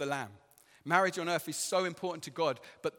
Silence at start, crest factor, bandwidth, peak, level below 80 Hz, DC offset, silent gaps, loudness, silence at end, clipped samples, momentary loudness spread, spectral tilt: 0 s; 22 dB; 17.5 kHz; -12 dBFS; -80 dBFS; under 0.1%; none; -33 LUFS; 0.1 s; under 0.1%; 10 LU; -3.5 dB/octave